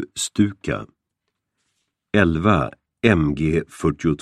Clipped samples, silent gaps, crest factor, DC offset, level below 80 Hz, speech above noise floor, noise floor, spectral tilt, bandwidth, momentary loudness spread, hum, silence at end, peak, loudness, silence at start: under 0.1%; none; 20 dB; under 0.1%; -40 dBFS; 59 dB; -79 dBFS; -6 dB/octave; 13.5 kHz; 10 LU; none; 0.05 s; 0 dBFS; -21 LUFS; 0 s